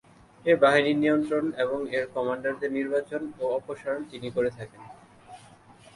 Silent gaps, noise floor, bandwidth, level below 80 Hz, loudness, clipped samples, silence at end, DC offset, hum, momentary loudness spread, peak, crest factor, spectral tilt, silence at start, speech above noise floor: none; -53 dBFS; 11.5 kHz; -66 dBFS; -27 LUFS; under 0.1%; 0.6 s; under 0.1%; none; 12 LU; -6 dBFS; 20 dB; -6 dB/octave; 0.45 s; 26 dB